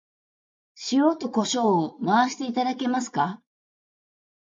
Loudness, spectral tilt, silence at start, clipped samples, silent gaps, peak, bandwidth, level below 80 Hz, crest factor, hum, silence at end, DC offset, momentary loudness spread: -24 LUFS; -4.5 dB/octave; 0.75 s; under 0.1%; none; -8 dBFS; 9.4 kHz; -76 dBFS; 18 dB; none; 1.15 s; under 0.1%; 6 LU